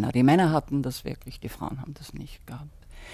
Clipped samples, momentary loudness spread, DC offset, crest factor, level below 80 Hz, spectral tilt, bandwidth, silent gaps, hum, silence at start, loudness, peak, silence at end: under 0.1%; 22 LU; under 0.1%; 18 dB; -48 dBFS; -7 dB/octave; 16 kHz; none; none; 0 s; -25 LUFS; -8 dBFS; 0 s